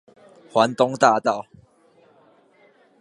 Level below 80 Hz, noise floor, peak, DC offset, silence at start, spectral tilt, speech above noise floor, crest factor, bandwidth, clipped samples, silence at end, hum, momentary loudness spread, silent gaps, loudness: -70 dBFS; -57 dBFS; -2 dBFS; under 0.1%; 0.55 s; -4.5 dB/octave; 38 dB; 22 dB; 11.5 kHz; under 0.1%; 1.6 s; none; 8 LU; none; -20 LUFS